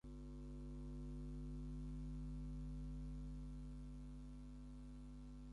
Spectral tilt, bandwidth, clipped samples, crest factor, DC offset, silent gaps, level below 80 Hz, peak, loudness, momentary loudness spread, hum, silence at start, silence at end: -8.5 dB/octave; 11 kHz; under 0.1%; 8 dB; under 0.1%; none; -52 dBFS; -42 dBFS; -53 LUFS; 6 LU; 50 Hz at -50 dBFS; 0.05 s; 0 s